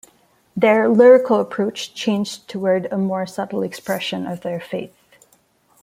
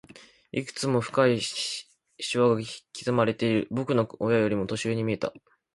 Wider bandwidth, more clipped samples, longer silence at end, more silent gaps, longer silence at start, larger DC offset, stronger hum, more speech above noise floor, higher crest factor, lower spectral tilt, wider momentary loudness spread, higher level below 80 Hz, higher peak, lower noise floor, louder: first, 15.5 kHz vs 11.5 kHz; neither; first, 0.95 s vs 0.35 s; neither; first, 0.55 s vs 0.15 s; neither; neither; first, 41 dB vs 24 dB; about the same, 18 dB vs 20 dB; about the same, -5.5 dB/octave vs -5.5 dB/octave; first, 16 LU vs 11 LU; about the same, -66 dBFS vs -62 dBFS; first, -2 dBFS vs -8 dBFS; first, -59 dBFS vs -50 dBFS; first, -18 LUFS vs -27 LUFS